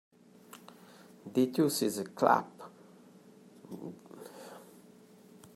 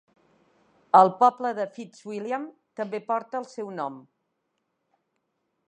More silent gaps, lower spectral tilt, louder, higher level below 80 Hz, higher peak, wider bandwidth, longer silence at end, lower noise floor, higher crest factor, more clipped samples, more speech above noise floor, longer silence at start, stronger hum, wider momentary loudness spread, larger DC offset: neither; about the same, -5 dB/octave vs -6 dB/octave; second, -30 LUFS vs -25 LUFS; about the same, -82 dBFS vs -86 dBFS; second, -10 dBFS vs -4 dBFS; first, 16 kHz vs 8.8 kHz; second, 0.95 s vs 1.7 s; second, -58 dBFS vs -78 dBFS; about the same, 26 dB vs 24 dB; neither; second, 29 dB vs 53 dB; first, 1.25 s vs 0.95 s; first, 60 Hz at -65 dBFS vs none; first, 25 LU vs 17 LU; neither